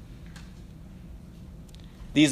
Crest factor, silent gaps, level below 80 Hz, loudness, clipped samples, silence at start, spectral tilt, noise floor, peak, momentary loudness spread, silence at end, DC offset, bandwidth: 22 dB; none; -48 dBFS; -25 LUFS; under 0.1%; 0.1 s; -4.5 dB/octave; -45 dBFS; -8 dBFS; 18 LU; 0 s; under 0.1%; 10.5 kHz